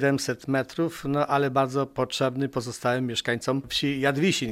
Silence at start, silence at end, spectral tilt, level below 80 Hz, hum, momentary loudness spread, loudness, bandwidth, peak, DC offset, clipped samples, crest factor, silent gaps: 0 s; 0 s; -5 dB/octave; -58 dBFS; none; 5 LU; -26 LUFS; 16 kHz; -8 dBFS; under 0.1%; under 0.1%; 18 dB; none